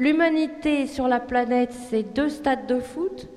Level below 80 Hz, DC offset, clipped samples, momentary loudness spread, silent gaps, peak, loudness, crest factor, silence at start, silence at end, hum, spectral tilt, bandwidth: -52 dBFS; under 0.1%; under 0.1%; 6 LU; none; -8 dBFS; -24 LUFS; 14 dB; 0 s; 0 s; none; -5 dB/octave; 12.5 kHz